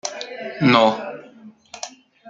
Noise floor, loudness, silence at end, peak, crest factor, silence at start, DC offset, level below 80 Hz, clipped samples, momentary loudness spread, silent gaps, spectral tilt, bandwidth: -45 dBFS; -19 LUFS; 0 s; -2 dBFS; 20 dB; 0.05 s; under 0.1%; -64 dBFS; under 0.1%; 22 LU; none; -4.5 dB/octave; 9.2 kHz